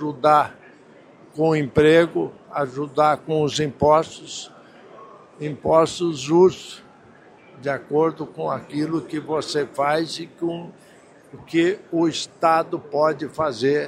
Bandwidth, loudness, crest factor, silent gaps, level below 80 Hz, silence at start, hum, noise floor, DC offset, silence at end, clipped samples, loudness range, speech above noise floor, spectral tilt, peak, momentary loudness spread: 12.5 kHz; -21 LUFS; 18 dB; none; -56 dBFS; 0 s; none; -49 dBFS; under 0.1%; 0 s; under 0.1%; 5 LU; 28 dB; -5.5 dB/octave; -2 dBFS; 15 LU